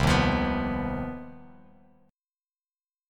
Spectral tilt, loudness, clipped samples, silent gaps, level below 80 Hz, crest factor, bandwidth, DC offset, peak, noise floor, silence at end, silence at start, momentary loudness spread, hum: -6 dB/octave; -27 LUFS; under 0.1%; none; -40 dBFS; 20 dB; 15.5 kHz; under 0.1%; -10 dBFS; under -90 dBFS; 1.65 s; 0 s; 18 LU; none